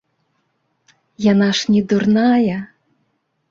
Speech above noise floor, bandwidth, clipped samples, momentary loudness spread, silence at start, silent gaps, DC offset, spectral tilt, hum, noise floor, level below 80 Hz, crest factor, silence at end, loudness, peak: 53 dB; 7.6 kHz; under 0.1%; 9 LU; 1.2 s; none; under 0.1%; -6 dB/octave; none; -68 dBFS; -56 dBFS; 14 dB; 0.85 s; -16 LUFS; -4 dBFS